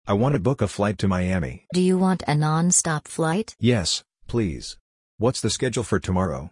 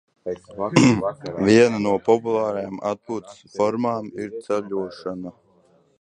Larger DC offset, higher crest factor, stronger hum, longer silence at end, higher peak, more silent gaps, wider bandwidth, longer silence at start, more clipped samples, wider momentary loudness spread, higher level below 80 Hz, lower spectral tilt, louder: neither; second, 16 dB vs 22 dB; neither; second, 0.05 s vs 0.7 s; second, -6 dBFS vs 0 dBFS; first, 4.80-5.18 s vs none; about the same, 11 kHz vs 10.5 kHz; second, 0.05 s vs 0.25 s; neither; second, 7 LU vs 16 LU; first, -46 dBFS vs -58 dBFS; about the same, -5 dB/octave vs -6 dB/octave; about the same, -23 LUFS vs -22 LUFS